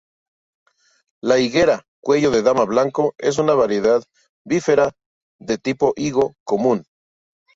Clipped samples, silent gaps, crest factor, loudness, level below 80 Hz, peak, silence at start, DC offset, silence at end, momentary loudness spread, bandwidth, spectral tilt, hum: under 0.1%; 1.88-2.03 s, 4.29-4.45 s, 5.06-5.39 s, 6.40-6.46 s; 16 dB; -19 LUFS; -54 dBFS; -2 dBFS; 1.25 s; under 0.1%; 0.75 s; 7 LU; 7.8 kHz; -5 dB/octave; none